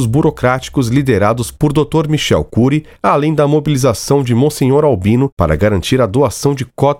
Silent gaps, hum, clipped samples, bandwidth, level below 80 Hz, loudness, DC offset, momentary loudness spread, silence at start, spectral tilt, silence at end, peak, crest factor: 5.32-5.37 s; none; under 0.1%; 16.5 kHz; -34 dBFS; -13 LUFS; under 0.1%; 3 LU; 0 s; -6.5 dB/octave; 0 s; 0 dBFS; 12 dB